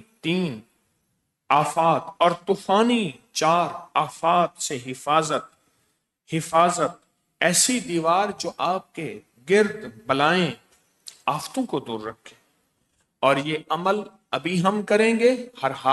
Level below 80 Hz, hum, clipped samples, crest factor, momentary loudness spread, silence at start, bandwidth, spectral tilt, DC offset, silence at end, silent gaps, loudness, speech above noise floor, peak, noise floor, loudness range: -68 dBFS; none; under 0.1%; 18 dB; 11 LU; 0.25 s; 12 kHz; -4 dB/octave; under 0.1%; 0 s; none; -23 LUFS; 51 dB; -6 dBFS; -74 dBFS; 5 LU